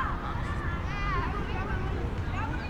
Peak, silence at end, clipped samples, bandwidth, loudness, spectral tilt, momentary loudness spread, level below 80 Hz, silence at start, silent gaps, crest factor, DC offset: -18 dBFS; 0 s; under 0.1%; 10 kHz; -32 LUFS; -7 dB/octave; 3 LU; -36 dBFS; 0 s; none; 12 dB; under 0.1%